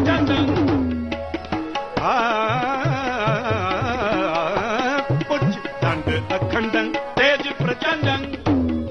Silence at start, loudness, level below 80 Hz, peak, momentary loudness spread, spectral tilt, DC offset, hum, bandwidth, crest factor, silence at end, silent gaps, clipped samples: 0 s; -21 LUFS; -44 dBFS; -6 dBFS; 6 LU; -6.5 dB/octave; 0.1%; none; 7.2 kHz; 14 dB; 0 s; none; under 0.1%